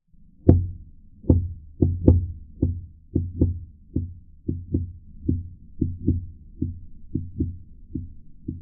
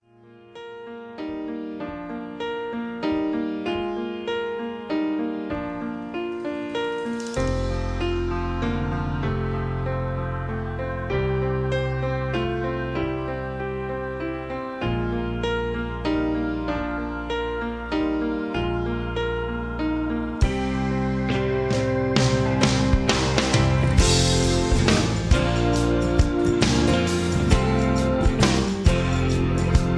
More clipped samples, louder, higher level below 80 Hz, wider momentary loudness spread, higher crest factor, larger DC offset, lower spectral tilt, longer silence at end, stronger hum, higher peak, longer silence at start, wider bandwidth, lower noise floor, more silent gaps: neither; about the same, -26 LUFS vs -24 LUFS; second, -36 dBFS vs -30 dBFS; first, 18 LU vs 10 LU; about the same, 26 dB vs 22 dB; neither; first, -15.5 dB/octave vs -5.5 dB/octave; about the same, 0 s vs 0 s; neither; about the same, 0 dBFS vs -2 dBFS; first, 0.45 s vs 0.25 s; second, 1.3 kHz vs 11 kHz; second, -45 dBFS vs -50 dBFS; neither